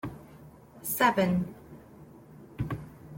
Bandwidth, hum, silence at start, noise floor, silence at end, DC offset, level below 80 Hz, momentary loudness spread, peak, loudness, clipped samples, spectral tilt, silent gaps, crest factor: 17 kHz; none; 0.05 s; -51 dBFS; 0 s; under 0.1%; -56 dBFS; 27 LU; -12 dBFS; -29 LUFS; under 0.1%; -5 dB/octave; none; 22 dB